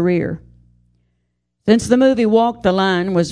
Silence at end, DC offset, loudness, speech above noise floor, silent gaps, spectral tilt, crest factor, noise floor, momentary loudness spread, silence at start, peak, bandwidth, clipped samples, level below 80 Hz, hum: 0 s; under 0.1%; -16 LUFS; 55 dB; none; -6 dB/octave; 16 dB; -70 dBFS; 12 LU; 0 s; 0 dBFS; 11 kHz; under 0.1%; -48 dBFS; 60 Hz at -50 dBFS